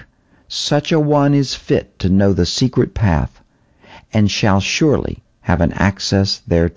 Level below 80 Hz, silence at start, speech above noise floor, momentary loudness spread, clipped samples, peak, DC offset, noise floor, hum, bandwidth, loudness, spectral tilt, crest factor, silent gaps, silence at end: -30 dBFS; 0 s; 35 dB; 7 LU; under 0.1%; -2 dBFS; 0.2%; -50 dBFS; none; 8 kHz; -16 LUFS; -5.5 dB/octave; 16 dB; none; 0.05 s